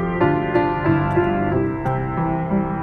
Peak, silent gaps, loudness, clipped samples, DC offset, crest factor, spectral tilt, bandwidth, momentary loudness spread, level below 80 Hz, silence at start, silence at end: -4 dBFS; none; -20 LUFS; under 0.1%; under 0.1%; 16 dB; -10 dB/octave; 4.8 kHz; 4 LU; -38 dBFS; 0 s; 0 s